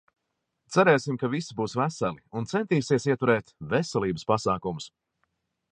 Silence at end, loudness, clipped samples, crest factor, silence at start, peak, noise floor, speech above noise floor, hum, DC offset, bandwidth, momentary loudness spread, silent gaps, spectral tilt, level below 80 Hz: 0.85 s; -26 LUFS; under 0.1%; 22 dB; 0.7 s; -6 dBFS; -80 dBFS; 55 dB; none; under 0.1%; 10 kHz; 9 LU; none; -6 dB/octave; -60 dBFS